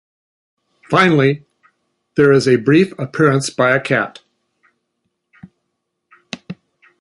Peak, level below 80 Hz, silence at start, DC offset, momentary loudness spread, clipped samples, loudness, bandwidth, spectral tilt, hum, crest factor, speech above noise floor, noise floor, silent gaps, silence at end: -2 dBFS; -58 dBFS; 0.9 s; under 0.1%; 20 LU; under 0.1%; -15 LUFS; 11.5 kHz; -6 dB/octave; none; 16 dB; 60 dB; -74 dBFS; none; 0.5 s